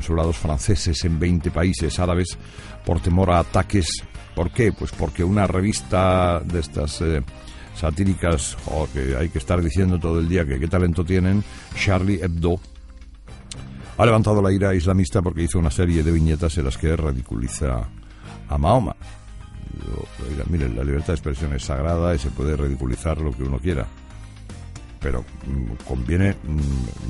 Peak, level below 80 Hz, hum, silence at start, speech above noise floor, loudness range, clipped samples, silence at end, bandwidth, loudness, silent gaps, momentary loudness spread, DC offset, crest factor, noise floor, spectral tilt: -4 dBFS; -30 dBFS; none; 0 s; 20 dB; 5 LU; under 0.1%; 0 s; 11.5 kHz; -22 LUFS; none; 16 LU; under 0.1%; 18 dB; -40 dBFS; -6.5 dB/octave